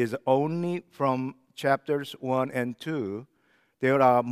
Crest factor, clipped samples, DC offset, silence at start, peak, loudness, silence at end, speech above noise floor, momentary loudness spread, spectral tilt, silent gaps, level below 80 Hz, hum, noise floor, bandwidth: 20 dB; under 0.1%; under 0.1%; 0 s; -8 dBFS; -27 LUFS; 0 s; 41 dB; 10 LU; -7 dB/octave; none; -78 dBFS; none; -67 dBFS; 15 kHz